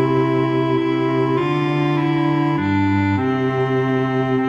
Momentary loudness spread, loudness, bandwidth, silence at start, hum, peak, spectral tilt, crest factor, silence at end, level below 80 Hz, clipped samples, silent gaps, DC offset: 2 LU; -18 LUFS; 7.6 kHz; 0 s; none; -6 dBFS; -8.5 dB/octave; 12 dB; 0 s; -54 dBFS; under 0.1%; none; under 0.1%